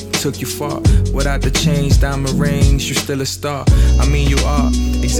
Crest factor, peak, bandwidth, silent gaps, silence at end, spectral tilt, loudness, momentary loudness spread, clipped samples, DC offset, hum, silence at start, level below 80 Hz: 14 dB; 0 dBFS; 16.5 kHz; none; 0 s; -5 dB/octave; -16 LUFS; 6 LU; under 0.1%; under 0.1%; none; 0 s; -16 dBFS